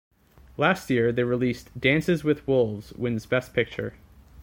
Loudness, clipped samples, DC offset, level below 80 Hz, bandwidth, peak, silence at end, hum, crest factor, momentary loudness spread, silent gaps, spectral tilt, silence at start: -25 LUFS; under 0.1%; under 0.1%; -52 dBFS; 17 kHz; -6 dBFS; 0 s; none; 20 dB; 8 LU; none; -6.5 dB/octave; 0.6 s